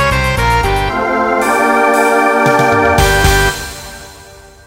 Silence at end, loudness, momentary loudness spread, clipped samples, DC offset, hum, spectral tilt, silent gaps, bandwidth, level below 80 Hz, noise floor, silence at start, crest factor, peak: 0.3 s; -11 LUFS; 13 LU; under 0.1%; under 0.1%; none; -4.5 dB/octave; none; 16.5 kHz; -22 dBFS; -37 dBFS; 0 s; 12 dB; 0 dBFS